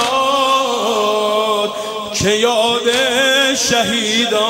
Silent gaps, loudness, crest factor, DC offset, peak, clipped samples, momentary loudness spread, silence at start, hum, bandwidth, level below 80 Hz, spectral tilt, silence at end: none; -14 LUFS; 14 dB; under 0.1%; -2 dBFS; under 0.1%; 5 LU; 0 s; none; 16.5 kHz; -48 dBFS; -2 dB/octave; 0 s